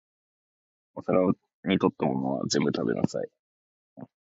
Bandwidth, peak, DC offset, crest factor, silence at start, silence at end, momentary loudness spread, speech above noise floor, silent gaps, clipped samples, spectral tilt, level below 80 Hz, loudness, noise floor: 8 kHz; -8 dBFS; under 0.1%; 22 dB; 0.95 s; 0.3 s; 12 LU; over 64 dB; 1.54-1.63 s, 3.39-3.96 s; under 0.1%; -5.5 dB/octave; -62 dBFS; -27 LUFS; under -90 dBFS